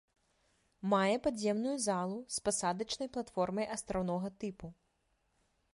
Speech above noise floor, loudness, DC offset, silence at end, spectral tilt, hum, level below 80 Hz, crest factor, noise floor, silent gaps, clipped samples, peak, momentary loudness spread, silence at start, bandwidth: 43 dB; -35 LUFS; under 0.1%; 1 s; -4.5 dB/octave; none; -64 dBFS; 18 dB; -78 dBFS; none; under 0.1%; -18 dBFS; 11 LU; 0.85 s; 11.5 kHz